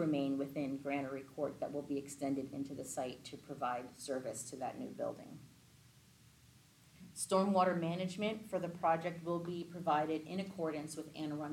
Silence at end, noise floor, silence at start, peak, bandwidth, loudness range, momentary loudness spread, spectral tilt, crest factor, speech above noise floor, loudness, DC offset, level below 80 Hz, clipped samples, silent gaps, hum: 0 s; -64 dBFS; 0 s; -20 dBFS; 16.5 kHz; 8 LU; 10 LU; -5.5 dB/octave; 20 dB; 26 dB; -39 LUFS; under 0.1%; -76 dBFS; under 0.1%; none; none